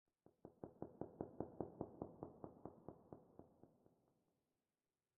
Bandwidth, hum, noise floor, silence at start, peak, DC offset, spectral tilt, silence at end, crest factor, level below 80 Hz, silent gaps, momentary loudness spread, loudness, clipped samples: 1.9 kHz; none; under -90 dBFS; 0.25 s; -30 dBFS; under 0.1%; -3 dB/octave; 1.25 s; 26 dB; -80 dBFS; none; 14 LU; -56 LUFS; under 0.1%